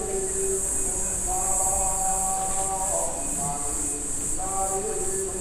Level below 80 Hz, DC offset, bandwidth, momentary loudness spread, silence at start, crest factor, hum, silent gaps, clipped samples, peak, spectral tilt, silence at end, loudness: -38 dBFS; under 0.1%; 16 kHz; 4 LU; 0 s; 16 dB; none; none; under 0.1%; -10 dBFS; -2.5 dB/octave; 0 s; -24 LUFS